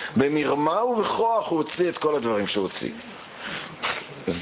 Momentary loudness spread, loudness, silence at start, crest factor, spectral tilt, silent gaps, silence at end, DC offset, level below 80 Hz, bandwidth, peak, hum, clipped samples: 11 LU; -25 LUFS; 0 s; 20 dB; -9.5 dB/octave; none; 0 s; under 0.1%; -58 dBFS; 4 kHz; -6 dBFS; none; under 0.1%